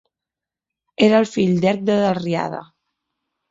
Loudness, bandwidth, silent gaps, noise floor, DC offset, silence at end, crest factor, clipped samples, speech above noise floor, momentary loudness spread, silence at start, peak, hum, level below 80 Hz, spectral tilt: -18 LUFS; 7.8 kHz; none; -87 dBFS; under 0.1%; 0.85 s; 18 dB; under 0.1%; 70 dB; 14 LU; 1 s; -2 dBFS; none; -60 dBFS; -6.5 dB/octave